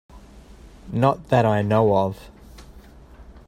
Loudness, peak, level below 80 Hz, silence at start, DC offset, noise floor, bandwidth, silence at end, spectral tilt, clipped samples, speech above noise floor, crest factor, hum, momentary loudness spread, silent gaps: -20 LUFS; -2 dBFS; -46 dBFS; 0.15 s; under 0.1%; -45 dBFS; 13.5 kHz; 0.1 s; -8 dB/octave; under 0.1%; 26 dB; 20 dB; none; 11 LU; none